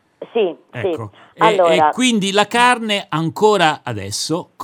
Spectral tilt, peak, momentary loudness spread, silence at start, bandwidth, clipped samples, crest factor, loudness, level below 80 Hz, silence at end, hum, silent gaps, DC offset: -4 dB/octave; 0 dBFS; 11 LU; 0.2 s; 18.5 kHz; under 0.1%; 16 dB; -16 LUFS; -66 dBFS; 0 s; none; none; under 0.1%